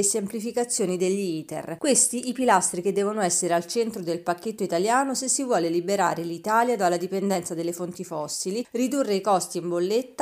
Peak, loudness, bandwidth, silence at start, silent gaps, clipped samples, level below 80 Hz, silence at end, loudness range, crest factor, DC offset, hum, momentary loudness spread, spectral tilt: -6 dBFS; -25 LUFS; 15.5 kHz; 0 s; none; under 0.1%; -72 dBFS; 0 s; 3 LU; 20 dB; under 0.1%; none; 8 LU; -3.5 dB/octave